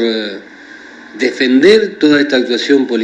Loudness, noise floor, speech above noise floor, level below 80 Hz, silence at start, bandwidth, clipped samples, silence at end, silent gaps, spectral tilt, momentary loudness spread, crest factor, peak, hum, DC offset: -11 LUFS; -35 dBFS; 23 dB; -58 dBFS; 0 s; 10 kHz; 0.2%; 0 s; none; -4.5 dB/octave; 15 LU; 12 dB; 0 dBFS; none; under 0.1%